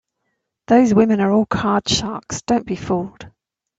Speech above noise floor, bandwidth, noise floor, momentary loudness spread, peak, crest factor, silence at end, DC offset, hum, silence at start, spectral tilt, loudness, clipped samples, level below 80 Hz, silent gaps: 57 dB; 8 kHz; -74 dBFS; 11 LU; -2 dBFS; 18 dB; 0.5 s; under 0.1%; none; 0.7 s; -5 dB/octave; -18 LUFS; under 0.1%; -48 dBFS; none